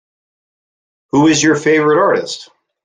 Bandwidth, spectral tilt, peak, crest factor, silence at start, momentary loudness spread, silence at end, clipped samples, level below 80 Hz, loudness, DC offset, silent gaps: 9.6 kHz; -4 dB/octave; -2 dBFS; 14 dB; 1.15 s; 11 LU; 0.4 s; under 0.1%; -56 dBFS; -12 LUFS; under 0.1%; none